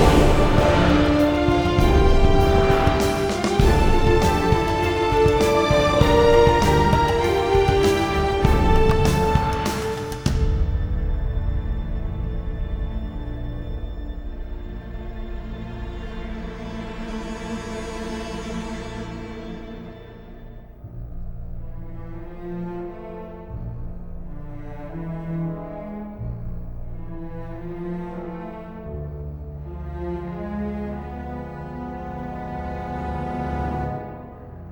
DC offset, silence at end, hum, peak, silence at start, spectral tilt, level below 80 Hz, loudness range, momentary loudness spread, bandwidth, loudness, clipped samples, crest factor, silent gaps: under 0.1%; 0 s; none; -2 dBFS; 0 s; -6.5 dB/octave; -26 dBFS; 17 LU; 19 LU; over 20 kHz; -22 LUFS; under 0.1%; 20 dB; none